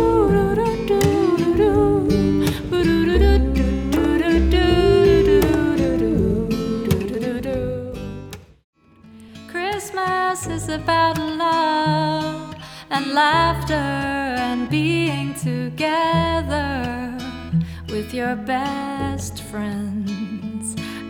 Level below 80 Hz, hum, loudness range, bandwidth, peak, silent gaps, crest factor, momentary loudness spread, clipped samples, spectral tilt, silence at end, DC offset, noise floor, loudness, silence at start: -30 dBFS; none; 9 LU; 19.5 kHz; -4 dBFS; 8.64-8.73 s; 16 dB; 11 LU; under 0.1%; -6 dB/octave; 0 s; under 0.1%; -46 dBFS; -20 LUFS; 0 s